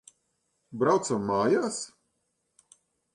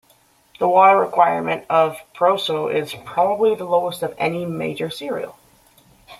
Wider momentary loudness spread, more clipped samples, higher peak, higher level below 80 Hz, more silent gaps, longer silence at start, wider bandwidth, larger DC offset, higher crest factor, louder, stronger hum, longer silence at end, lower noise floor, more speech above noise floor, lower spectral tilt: first, 15 LU vs 12 LU; neither; second, -12 dBFS vs -2 dBFS; about the same, -68 dBFS vs -64 dBFS; neither; about the same, 0.7 s vs 0.6 s; second, 11.5 kHz vs 15.5 kHz; neither; about the same, 18 dB vs 18 dB; second, -27 LUFS vs -19 LUFS; neither; first, 1.3 s vs 0.05 s; first, -77 dBFS vs -57 dBFS; first, 51 dB vs 38 dB; about the same, -5 dB/octave vs -5.5 dB/octave